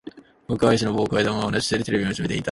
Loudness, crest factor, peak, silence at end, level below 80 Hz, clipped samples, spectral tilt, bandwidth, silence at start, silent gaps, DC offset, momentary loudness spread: -22 LUFS; 18 dB; -4 dBFS; 0 s; -48 dBFS; under 0.1%; -5 dB/octave; 11.5 kHz; 0.05 s; none; under 0.1%; 5 LU